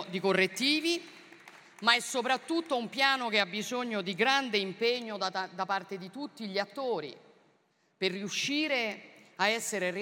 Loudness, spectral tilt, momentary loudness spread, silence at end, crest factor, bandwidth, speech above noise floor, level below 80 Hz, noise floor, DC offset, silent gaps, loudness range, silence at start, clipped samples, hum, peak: -30 LUFS; -3 dB/octave; 10 LU; 0 s; 24 dB; 16.5 kHz; 40 dB; -86 dBFS; -71 dBFS; under 0.1%; none; 6 LU; 0 s; under 0.1%; none; -8 dBFS